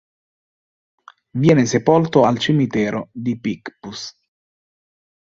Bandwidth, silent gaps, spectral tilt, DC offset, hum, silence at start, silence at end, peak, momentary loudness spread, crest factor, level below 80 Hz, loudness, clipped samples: 7.8 kHz; none; -6 dB/octave; under 0.1%; none; 1.35 s; 1.1 s; -2 dBFS; 16 LU; 18 dB; -56 dBFS; -17 LUFS; under 0.1%